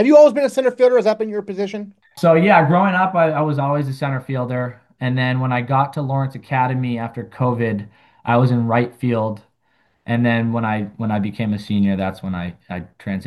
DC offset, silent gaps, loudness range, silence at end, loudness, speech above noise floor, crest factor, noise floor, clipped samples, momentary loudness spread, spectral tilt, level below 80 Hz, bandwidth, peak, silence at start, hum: under 0.1%; none; 5 LU; 0 s; -18 LUFS; 46 dB; 18 dB; -63 dBFS; under 0.1%; 14 LU; -8 dB/octave; -60 dBFS; 12.5 kHz; 0 dBFS; 0 s; none